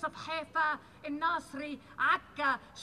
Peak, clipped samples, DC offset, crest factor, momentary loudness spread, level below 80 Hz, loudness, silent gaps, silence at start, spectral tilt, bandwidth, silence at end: -16 dBFS; under 0.1%; under 0.1%; 18 dB; 12 LU; -68 dBFS; -33 LUFS; none; 0 s; -3.5 dB/octave; 13 kHz; 0 s